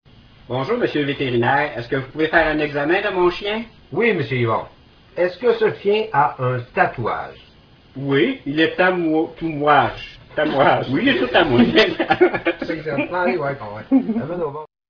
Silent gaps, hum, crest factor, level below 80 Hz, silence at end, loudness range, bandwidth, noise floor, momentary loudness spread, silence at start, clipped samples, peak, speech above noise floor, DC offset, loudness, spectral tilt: none; none; 20 dB; -48 dBFS; 0.25 s; 4 LU; 5.4 kHz; -48 dBFS; 10 LU; 0.5 s; under 0.1%; 0 dBFS; 29 dB; under 0.1%; -19 LUFS; -7.5 dB/octave